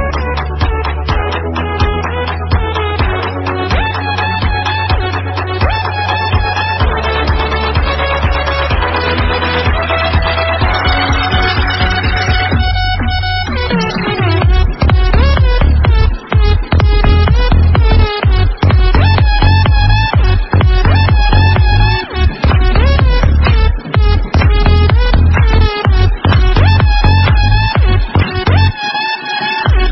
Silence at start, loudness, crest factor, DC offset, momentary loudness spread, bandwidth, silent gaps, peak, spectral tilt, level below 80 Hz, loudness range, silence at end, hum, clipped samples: 0 s; -12 LUFS; 10 dB; under 0.1%; 6 LU; 6 kHz; none; 0 dBFS; -7 dB/octave; -12 dBFS; 4 LU; 0 s; none; under 0.1%